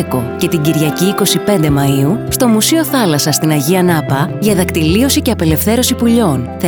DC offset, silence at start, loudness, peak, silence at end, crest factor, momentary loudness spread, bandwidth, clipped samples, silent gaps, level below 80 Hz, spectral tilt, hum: under 0.1%; 0 s; -12 LUFS; 0 dBFS; 0 s; 12 dB; 3 LU; over 20 kHz; under 0.1%; none; -34 dBFS; -5 dB/octave; none